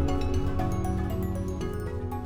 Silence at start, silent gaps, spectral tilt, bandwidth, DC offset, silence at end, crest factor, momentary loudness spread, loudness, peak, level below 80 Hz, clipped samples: 0 s; none; -7.5 dB/octave; 19.5 kHz; 0.2%; 0 s; 12 dB; 4 LU; -30 LUFS; -16 dBFS; -34 dBFS; under 0.1%